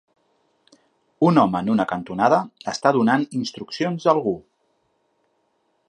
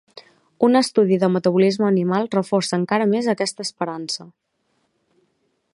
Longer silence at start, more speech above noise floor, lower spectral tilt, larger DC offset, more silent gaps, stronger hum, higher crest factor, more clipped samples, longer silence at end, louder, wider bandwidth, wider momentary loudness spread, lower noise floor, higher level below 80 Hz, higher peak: first, 1.2 s vs 0.15 s; about the same, 48 dB vs 50 dB; about the same, -6.5 dB/octave vs -5.5 dB/octave; neither; neither; neither; about the same, 20 dB vs 18 dB; neither; about the same, 1.5 s vs 1.45 s; about the same, -21 LUFS vs -20 LUFS; about the same, 11 kHz vs 11.5 kHz; about the same, 10 LU vs 10 LU; about the same, -68 dBFS vs -69 dBFS; first, -62 dBFS vs -70 dBFS; about the same, -2 dBFS vs -2 dBFS